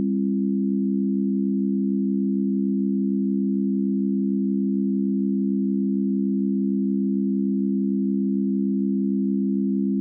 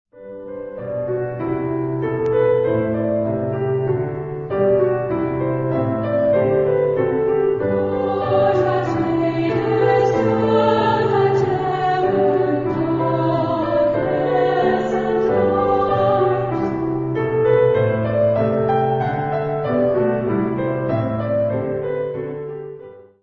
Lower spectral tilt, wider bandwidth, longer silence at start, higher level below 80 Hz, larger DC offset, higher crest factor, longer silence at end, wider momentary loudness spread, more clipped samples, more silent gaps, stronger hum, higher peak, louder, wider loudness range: first, -18 dB/octave vs -9 dB/octave; second, 0.5 kHz vs 7.4 kHz; second, 0 s vs 0.15 s; second, -82 dBFS vs -48 dBFS; neither; second, 8 dB vs 14 dB; second, 0 s vs 0.2 s; second, 0 LU vs 7 LU; neither; neither; first, 50 Hz at -25 dBFS vs none; second, -14 dBFS vs -4 dBFS; second, -23 LUFS vs -19 LUFS; second, 0 LU vs 3 LU